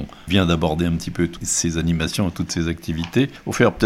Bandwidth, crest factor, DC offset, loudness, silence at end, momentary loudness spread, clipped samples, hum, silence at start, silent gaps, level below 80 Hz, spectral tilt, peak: 15.5 kHz; 18 dB; under 0.1%; -21 LUFS; 0 s; 5 LU; under 0.1%; none; 0 s; none; -38 dBFS; -4.5 dB/octave; -2 dBFS